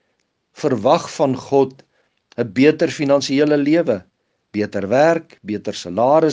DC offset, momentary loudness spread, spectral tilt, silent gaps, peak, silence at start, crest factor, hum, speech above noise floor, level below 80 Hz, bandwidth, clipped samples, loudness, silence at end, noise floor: under 0.1%; 10 LU; -6 dB/octave; none; 0 dBFS; 0.6 s; 18 dB; none; 52 dB; -66 dBFS; 9.6 kHz; under 0.1%; -18 LUFS; 0 s; -69 dBFS